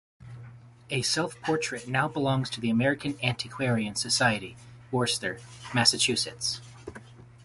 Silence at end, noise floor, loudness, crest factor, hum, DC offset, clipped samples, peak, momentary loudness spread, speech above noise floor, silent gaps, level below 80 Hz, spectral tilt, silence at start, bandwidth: 0 s; -48 dBFS; -27 LUFS; 24 dB; none; under 0.1%; under 0.1%; -6 dBFS; 21 LU; 20 dB; none; -60 dBFS; -3.5 dB/octave; 0.2 s; 12 kHz